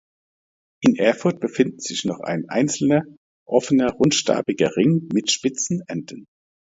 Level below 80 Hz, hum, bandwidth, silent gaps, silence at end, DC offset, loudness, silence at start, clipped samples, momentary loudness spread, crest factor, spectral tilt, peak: -60 dBFS; none; 8 kHz; 3.17-3.46 s; 0.5 s; under 0.1%; -21 LUFS; 0.8 s; under 0.1%; 8 LU; 20 dB; -4.5 dB/octave; -2 dBFS